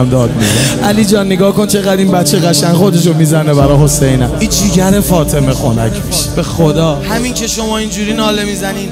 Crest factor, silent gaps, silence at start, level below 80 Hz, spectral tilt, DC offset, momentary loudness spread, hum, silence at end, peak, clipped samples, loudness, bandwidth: 10 dB; none; 0 s; -26 dBFS; -5 dB/octave; under 0.1%; 6 LU; none; 0 s; 0 dBFS; under 0.1%; -10 LUFS; 16.5 kHz